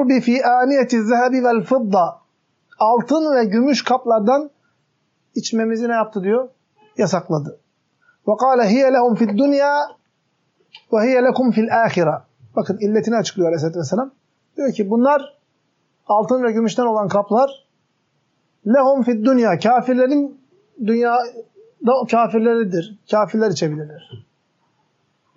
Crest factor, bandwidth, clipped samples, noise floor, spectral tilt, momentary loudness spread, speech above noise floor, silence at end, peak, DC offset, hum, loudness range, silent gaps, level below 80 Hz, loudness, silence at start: 14 dB; 7.6 kHz; under 0.1%; -67 dBFS; -5 dB/octave; 9 LU; 50 dB; 1.2 s; -4 dBFS; under 0.1%; none; 3 LU; none; -76 dBFS; -17 LUFS; 0 s